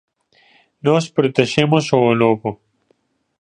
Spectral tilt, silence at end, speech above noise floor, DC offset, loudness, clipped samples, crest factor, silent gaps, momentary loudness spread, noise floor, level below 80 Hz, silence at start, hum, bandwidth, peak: -6 dB/octave; 0.85 s; 48 dB; under 0.1%; -17 LUFS; under 0.1%; 18 dB; none; 8 LU; -63 dBFS; -58 dBFS; 0.85 s; none; 10 kHz; 0 dBFS